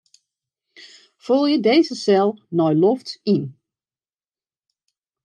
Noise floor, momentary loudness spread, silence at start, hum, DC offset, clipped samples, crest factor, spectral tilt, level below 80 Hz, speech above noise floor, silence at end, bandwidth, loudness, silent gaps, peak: under -90 dBFS; 7 LU; 0.8 s; none; under 0.1%; under 0.1%; 16 dB; -6.5 dB/octave; -74 dBFS; over 72 dB; 1.75 s; 9.6 kHz; -19 LUFS; none; -4 dBFS